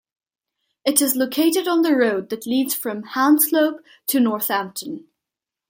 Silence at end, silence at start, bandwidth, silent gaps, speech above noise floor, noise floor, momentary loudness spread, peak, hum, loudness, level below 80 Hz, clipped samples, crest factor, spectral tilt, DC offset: 0.7 s; 0.85 s; 17 kHz; none; 67 dB; -86 dBFS; 12 LU; 0 dBFS; none; -19 LUFS; -74 dBFS; under 0.1%; 20 dB; -2.5 dB/octave; under 0.1%